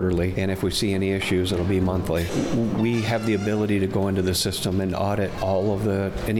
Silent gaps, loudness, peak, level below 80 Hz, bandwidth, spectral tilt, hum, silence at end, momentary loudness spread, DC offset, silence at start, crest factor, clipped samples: none; -23 LUFS; -12 dBFS; -42 dBFS; 17 kHz; -5.5 dB/octave; none; 0 s; 2 LU; under 0.1%; 0 s; 10 dB; under 0.1%